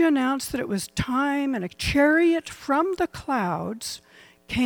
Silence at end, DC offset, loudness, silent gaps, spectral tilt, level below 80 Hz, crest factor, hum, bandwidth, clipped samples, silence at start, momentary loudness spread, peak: 0 s; under 0.1%; -24 LUFS; none; -5 dB/octave; -46 dBFS; 14 dB; none; 18.5 kHz; under 0.1%; 0 s; 11 LU; -10 dBFS